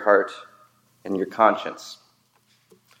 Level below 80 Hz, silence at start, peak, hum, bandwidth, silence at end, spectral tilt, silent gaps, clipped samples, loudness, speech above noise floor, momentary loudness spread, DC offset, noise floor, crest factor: -80 dBFS; 0 s; -2 dBFS; none; 16 kHz; 1.05 s; -5 dB/octave; none; under 0.1%; -23 LUFS; 42 dB; 22 LU; under 0.1%; -63 dBFS; 24 dB